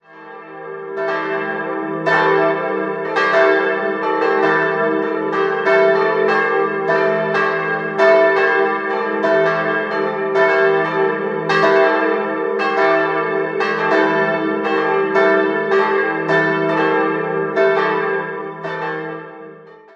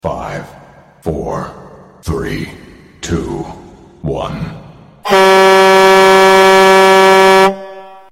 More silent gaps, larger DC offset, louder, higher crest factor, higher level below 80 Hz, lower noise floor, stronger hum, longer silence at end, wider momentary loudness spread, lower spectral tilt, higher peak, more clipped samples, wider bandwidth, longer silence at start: neither; neither; second, -16 LUFS vs -8 LUFS; about the same, 16 dB vs 12 dB; second, -68 dBFS vs -36 dBFS; about the same, -39 dBFS vs -40 dBFS; neither; about the same, 0.2 s vs 0.25 s; second, 9 LU vs 21 LU; first, -6 dB/octave vs -4 dB/octave; about the same, -2 dBFS vs 0 dBFS; neither; second, 7.4 kHz vs 16.5 kHz; about the same, 0.1 s vs 0.05 s